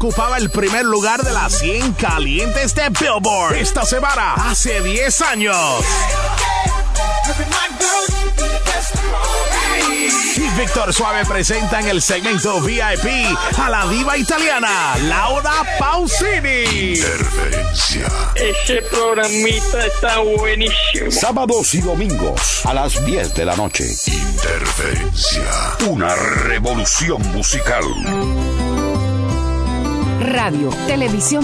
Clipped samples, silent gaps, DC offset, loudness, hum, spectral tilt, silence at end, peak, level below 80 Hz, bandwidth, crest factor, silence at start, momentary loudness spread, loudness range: under 0.1%; none; under 0.1%; -16 LUFS; none; -3 dB/octave; 0 s; -4 dBFS; -22 dBFS; 11 kHz; 12 dB; 0 s; 4 LU; 2 LU